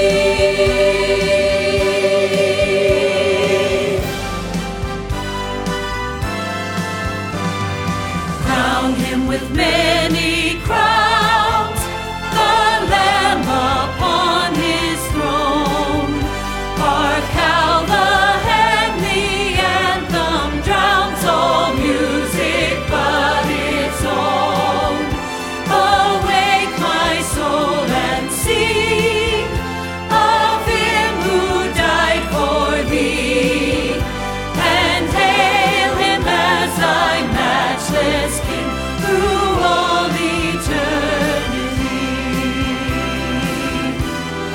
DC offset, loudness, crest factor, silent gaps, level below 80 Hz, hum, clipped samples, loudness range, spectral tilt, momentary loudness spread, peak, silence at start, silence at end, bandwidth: under 0.1%; -16 LUFS; 16 dB; none; -30 dBFS; none; under 0.1%; 4 LU; -4 dB/octave; 8 LU; -2 dBFS; 0 s; 0 s; 18.5 kHz